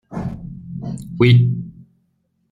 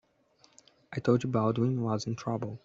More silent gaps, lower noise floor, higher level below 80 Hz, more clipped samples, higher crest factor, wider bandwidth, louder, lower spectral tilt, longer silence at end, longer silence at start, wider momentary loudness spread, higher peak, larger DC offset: neither; about the same, -66 dBFS vs -66 dBFS; first, -46 dBFS vs -68 dBFS; neither; about the same, 18 dB vs 20 dB; first, 9.2 kHz vs 7.8 kHz; first, -18 LUFS vs -30 LUFS; about the same, -8 dB/octave vs -7.5 dB/octave; first, 0.7 s vs 0.05 s; second, 0.1 s vs 0.9 s; first, 20 LU vs 7 LU; first, -2 dBFS vs -12 dBFS; neither